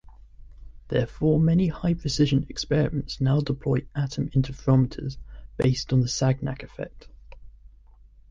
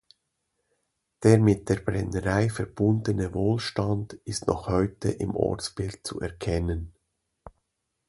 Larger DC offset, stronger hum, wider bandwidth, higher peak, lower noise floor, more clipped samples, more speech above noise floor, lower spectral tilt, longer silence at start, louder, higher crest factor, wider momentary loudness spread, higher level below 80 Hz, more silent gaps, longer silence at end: neither; neither; second, 7.6 kHz vs 11.5 kHz; second, -8 dBFS vs -4 dBFS; second, -51 dBFS vs -78 dBFS; neither; second, 28 dB vs 53 dB; about the same, -6.5 dB/octave vs -6.5 dB/octave; second, 0.05 s vs 1.2 s; about the same, -25 LUFS vs -27 LUFS; about the same, 18 dB vs 22 dB; about the same, 13 LU vs 12 LU; about the same, -42 dBFS vs -44 dBFS; neither; first, 0.8 s vs 0.6 s